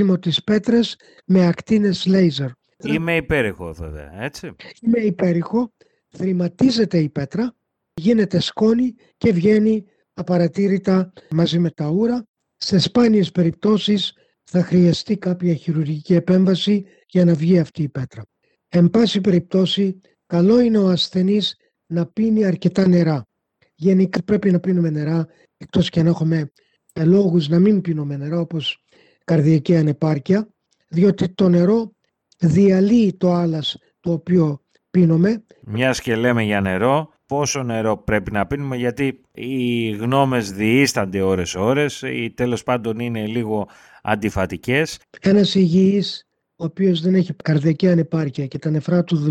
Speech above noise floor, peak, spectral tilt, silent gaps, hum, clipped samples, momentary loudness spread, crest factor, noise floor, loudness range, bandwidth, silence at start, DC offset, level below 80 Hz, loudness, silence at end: 48 dB; -2 dBFS; -6.5 dB/octave; 12.28-12.34 s; none; under 0.1%; 11 LU; 16 dB; -65 dBFS; 3 LU; 12.5 kHz; 0 s; under 0.1%; -50 dBFS; -19 LUFS; 0 s